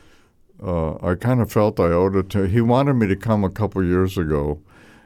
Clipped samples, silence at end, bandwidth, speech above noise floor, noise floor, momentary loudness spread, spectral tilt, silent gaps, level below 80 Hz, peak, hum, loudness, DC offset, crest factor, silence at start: under 0.1%; 0.45 s; 16 kHz; 34 dB; -53 dBFS; 7 LU; -8.5 dB/octave; none; -38 dBFS; -6 dBFS; none; -20 LUFS; under 0.1%; 14 dB; 0.6 s